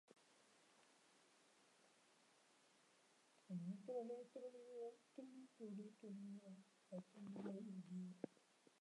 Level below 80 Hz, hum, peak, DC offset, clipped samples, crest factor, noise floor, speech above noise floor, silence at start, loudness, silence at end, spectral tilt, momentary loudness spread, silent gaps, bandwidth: under -90 dBFS; none; -34 dBFS; under 0.1%; under 0.1%; 24 dB; -76 dBFS; 22 dB; 0.1 s; -56 LUFS; 0 s; -7.5 dB/octave; 9 LU; none; 11 kHz